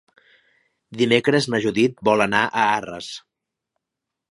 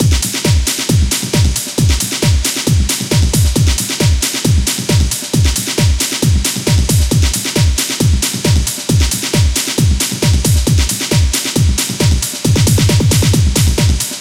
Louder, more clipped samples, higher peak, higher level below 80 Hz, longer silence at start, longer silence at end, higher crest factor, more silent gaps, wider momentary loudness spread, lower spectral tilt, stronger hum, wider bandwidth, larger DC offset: second, -19 LUFS vs -13 LUFS; neither; about the same, 0 dBFS vs 0 dBFS; second, -62 dBFS vs -18 dBFS; first, 0.9 s vs 0 s; first, 1.15 s vs 0 s; first, 22 dB vs 12 dB; neither; first, 16 LU vs 3 LU; about the same, -5 dB/octave vs -4 dB/octave; neither; second, 11.5 kHz vs 16.5 kHz; neither